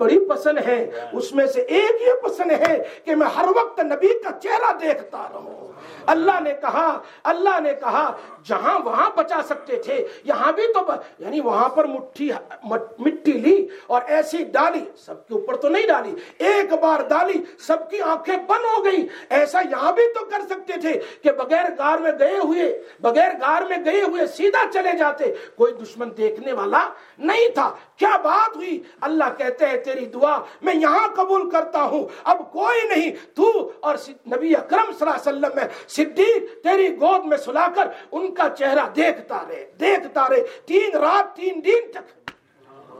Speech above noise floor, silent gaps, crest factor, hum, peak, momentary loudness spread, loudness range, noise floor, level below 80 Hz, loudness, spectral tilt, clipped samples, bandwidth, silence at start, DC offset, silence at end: 30 dB; none; 18 dB; none; -2 dBFS; 9 LU; 2 LU; -50 dBFS; -78 dBFS; -20 LUFS; -4 dB/octave; under 0.1%; 14 kHz; 0 s; under 0.1%; 0 s